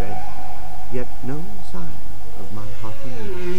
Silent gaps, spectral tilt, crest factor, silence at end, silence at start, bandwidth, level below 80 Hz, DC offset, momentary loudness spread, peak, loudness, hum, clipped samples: none; -6.5 dB/octave; 14 dB; 0 s; 0 s; 16.5 kHz; -40 dBFS; 40%; 7 LU; -4 dBFS; -34 LUFS; 50 Hz at -45 dBFS; under 0.1%